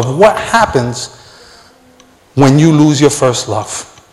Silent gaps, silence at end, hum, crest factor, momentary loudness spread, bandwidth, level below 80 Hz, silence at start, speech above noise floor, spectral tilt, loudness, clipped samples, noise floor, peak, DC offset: none; 0.3 s; none; 12 dB; 15 LU; 13.5 kHz; -40 dBFS; 0 s; 35 dB; -5.5 dB/octave; -11 LUFS; 0.8%; -45 dBFS; 0 dBFS; under 0.1%